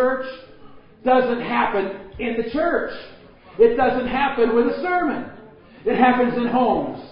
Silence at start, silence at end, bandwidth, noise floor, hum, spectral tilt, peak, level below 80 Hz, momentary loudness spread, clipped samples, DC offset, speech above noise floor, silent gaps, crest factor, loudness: 0 s; 0 s; 5.4 kHz; -44 dBFS; none; -10.5 dB/octave; -4 dBFS; -48 dBFS; 14 LU; under 0.1%; under 0.1%; 24 dB; none; 18 dB; -20 LUFS